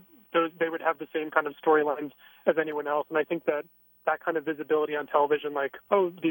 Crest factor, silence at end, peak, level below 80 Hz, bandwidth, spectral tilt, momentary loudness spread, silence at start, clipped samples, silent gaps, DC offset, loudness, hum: 20 dB; 0 s; -8 dBFS; -80 dBFS; 17 kHz; -8 dB/octave; 7 LU; 0.35 s; under 0.1%; none; under 0.1%; -28 LUFS; none